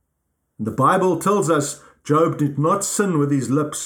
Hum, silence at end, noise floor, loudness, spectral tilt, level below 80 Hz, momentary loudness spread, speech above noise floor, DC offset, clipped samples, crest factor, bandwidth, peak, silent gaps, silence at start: none; 0 s; -73 dBFS; -19 LUFS; -5.5 dB/octave; -62 dBFS; 10 LU; 54 dB; under 0.1%; under 0.1%; 16 dB; 19 kHz; -4 dBFS; none; 0.6 s